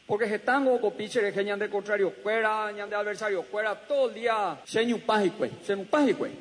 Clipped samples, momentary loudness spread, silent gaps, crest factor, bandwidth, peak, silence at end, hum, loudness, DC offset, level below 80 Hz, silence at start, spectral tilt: under 0.1%; 6 LU; none; 16 dB; 10.5 kHz; -12 dBFS; 0 s; none; -28 LUFS; under 0.1%; -76 dBFS; 0.1 s; -4.5 dB/octave